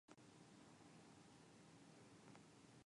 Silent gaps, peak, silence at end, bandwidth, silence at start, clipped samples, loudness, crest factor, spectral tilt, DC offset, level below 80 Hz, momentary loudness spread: none; -48 dBFS; 0.05 s; 11 kHz; 0.1 s; under 0.1%; -66 LUFS; 18 dB; -4.5 dB/octave; under 0.1%; -90 dBFS; 1 LU